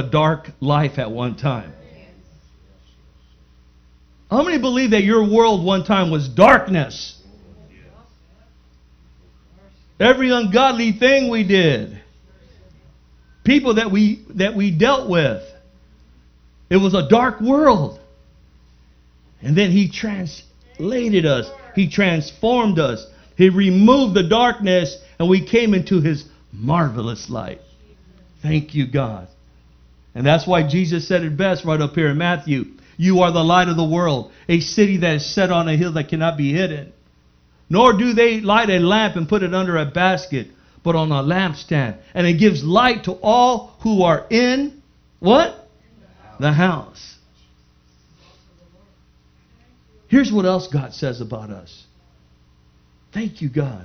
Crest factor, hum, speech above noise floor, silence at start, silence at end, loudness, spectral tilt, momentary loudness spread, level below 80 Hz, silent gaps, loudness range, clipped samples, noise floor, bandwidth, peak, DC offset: 18 dB; 60 Hz at -50 dBFS; 38 dB; 0 s; 0 s; -17 LUFS; -6.5 dB/octave; 13 LU; -46 dBFS; none; 8 LU; under 0.1%; -54 dBFS; 6.6 kHz; 0 dBFS; under 0.1%